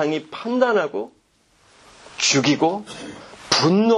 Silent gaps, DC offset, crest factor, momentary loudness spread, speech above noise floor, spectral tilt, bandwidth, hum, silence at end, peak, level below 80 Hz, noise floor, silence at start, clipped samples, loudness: none; under 0.1%; 22 dB; 20 LU; 40 dB; -3.5 dB/octave; 11 kHz; none; 0 s; 0 dBFS; -62 dBFS; -60 dBFS; 0 s; under 0.1%; -20 LUFS